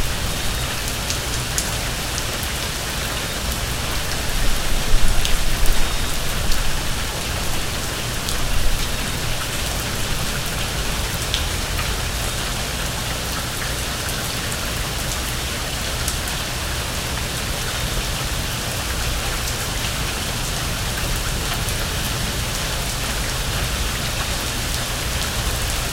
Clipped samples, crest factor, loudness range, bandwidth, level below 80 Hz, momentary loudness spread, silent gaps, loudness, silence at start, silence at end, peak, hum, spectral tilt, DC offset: under 0.1%; 20 dB; 1 LU; 17 kHz; -26 dBFS; 2 LU; none; -23 LUFS; 0 s; 0 s; 0 dBFS; none; -2.5 dB/octave; under 0.1%